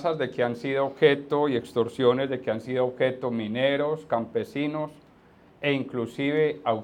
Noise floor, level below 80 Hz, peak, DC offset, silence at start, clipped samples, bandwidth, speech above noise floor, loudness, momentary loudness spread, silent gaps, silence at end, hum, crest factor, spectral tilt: -55 dBFS; -68 dBFS; -6 dBFS; under 0.1%; 0 s; under 0.1%; 10 kHz; 30 dB; -26 LUFS; 8 LU; none; 0 s; none; 20 dB; -7 dB/octave